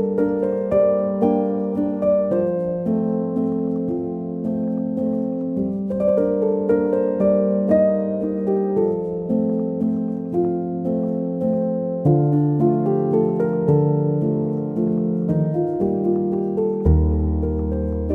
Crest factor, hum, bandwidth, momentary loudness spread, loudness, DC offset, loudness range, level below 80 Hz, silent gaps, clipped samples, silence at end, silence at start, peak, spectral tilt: 14 dB; none; 3.3 kHz; 6 LU; -21 LUFS; under 0.1%; 3 LU; -34 dBFS; none; under 0.1%; 0 s; 0 s; -6 dBFS; -12.5 dB/octave